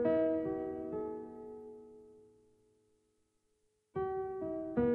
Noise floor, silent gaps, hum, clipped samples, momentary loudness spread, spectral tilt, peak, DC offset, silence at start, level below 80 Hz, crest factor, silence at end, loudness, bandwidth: -78 dBFS; none; none; under 0.1%; 20 LU; -9.5 dB/octave; -20 dBFS; under 0.1%; 0 s; -64 dBFS; 18 dB; 0 s; -38 LUFS; 4.2 kHz